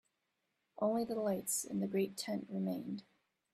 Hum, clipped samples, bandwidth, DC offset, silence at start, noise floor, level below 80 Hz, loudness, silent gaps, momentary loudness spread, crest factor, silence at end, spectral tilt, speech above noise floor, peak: none; under 0.1%; 15 kHz; under 0.1%; 0.75 s; -85 dBFS; -80 dBFS; -38 LUFS; none; 7 LU; 18 dB; 0.55 s; -5 dB/octave; 47 dB; -22 dBFS